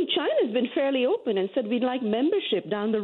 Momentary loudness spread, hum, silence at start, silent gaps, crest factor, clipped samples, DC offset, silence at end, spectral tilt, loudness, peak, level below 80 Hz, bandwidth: 3 LU; none; 0 s; none; 12 dB; under 0.1%; under 0.1%; 0 s; -8.5 dB/octave; -25 LUFS; -12 dBFS; -74 dBFS; 4.3 kHz